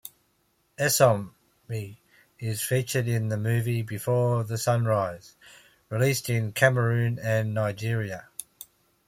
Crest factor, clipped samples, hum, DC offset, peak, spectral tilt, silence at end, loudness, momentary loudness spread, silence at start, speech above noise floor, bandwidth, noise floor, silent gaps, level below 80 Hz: 22 dB; under 0.1%; none; under 0.1%; -6 dBFS; -5 dB/octave; 0.65 s; -26 LUFS; 19 LU; 0.05 s; 44 dB; 16.5 kHz; -69 dBFS; none; -62 dBFS